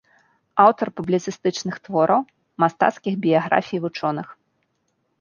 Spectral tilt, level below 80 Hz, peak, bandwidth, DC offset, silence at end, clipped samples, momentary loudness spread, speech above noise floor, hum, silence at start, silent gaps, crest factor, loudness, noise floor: -6 dB/octave; -66 dBFS; -2 dBFS; 7.2 kHz; under 0.1%; 0.85 s; under 0.1%; 10 LU; 51 dB; none; 0.55 s; none; 20 dB; -21 LUFS; -71 dBFS